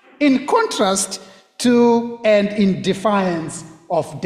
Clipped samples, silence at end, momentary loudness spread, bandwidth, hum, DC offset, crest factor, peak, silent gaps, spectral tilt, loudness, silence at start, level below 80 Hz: under 0.1%; 0 s; 10 LU; 14.5 kHz; none; under 0.1%; 14 dB; -4 dBFS; none; -4.5 dB/octave; -17 LUFS; 0.2 s; -56 dBFS